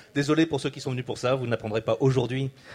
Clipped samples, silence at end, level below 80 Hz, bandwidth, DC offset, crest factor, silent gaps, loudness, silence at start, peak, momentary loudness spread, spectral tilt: under 0.1%; 0 s; -58 dBFS; 11 kHz; under 0.1%; 16 dB; none; -26 LUFS; 0.15 s; -10 dBFS; 8 LU; -6.5 dB/octave